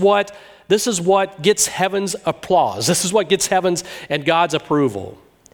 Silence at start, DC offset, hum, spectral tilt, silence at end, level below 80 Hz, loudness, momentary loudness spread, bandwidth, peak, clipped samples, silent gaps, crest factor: 0 s; under 0.1%; none; -3.5 dB/octave; 0.4 s; -56 dBFS; -18 LUFS; 8 LU; over 20 kHz; -2 dBFS; under 0.1%; none; 16 dB